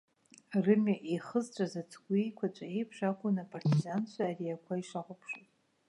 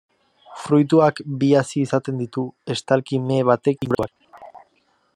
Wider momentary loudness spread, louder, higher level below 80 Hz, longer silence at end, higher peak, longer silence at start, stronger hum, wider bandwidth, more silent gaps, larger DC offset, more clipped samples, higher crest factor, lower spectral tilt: first, 14 LU vs 11 LU; second, -35 LUFS vs -20 LUFS; second, -82 dBFS vs -60 dBFS; about the same, 0.5 s vs 0.6 s; second, -14 dBFS vs -2 dBFS; about the same, 0.5 s vs 0.5 s; neither; about the same, 11 kHz vs 11 kHz; neither; neither; neither; about the same, 20 dB vs 18 dB; about the same, -7.5 dB/octave vs -7 dB/octave